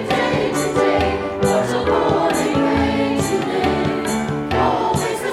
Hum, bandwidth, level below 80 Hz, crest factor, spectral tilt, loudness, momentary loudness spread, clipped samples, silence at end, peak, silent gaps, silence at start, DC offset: none; 15 kHz; -38 dBFS; 14 dB; -5 dB/octave; -18 LUFS; 3 LU; under 0.1%; 0 s; -4 dBFS; none; 0 s; under 0.1%